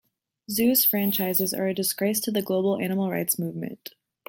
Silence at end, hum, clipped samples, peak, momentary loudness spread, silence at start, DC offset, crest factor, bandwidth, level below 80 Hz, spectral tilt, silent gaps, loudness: 0.55 s; none; under 0.1%; -6 dBFS; 14 LU; 0.5 s; under 0.1%; 20 dB; 17 kHz; -68 dBFS; -4 dB/octave; none; -24 LUFS